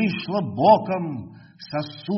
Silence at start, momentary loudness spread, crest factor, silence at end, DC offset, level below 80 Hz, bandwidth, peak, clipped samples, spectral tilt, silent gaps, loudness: 0 s; 14 LU; 20 dB; 0 s; under 0.1%; -62 dBFS; 6 kHz; -4 dBFS; under 0.1%; -5.5 dB/octave; none; -22 LUFS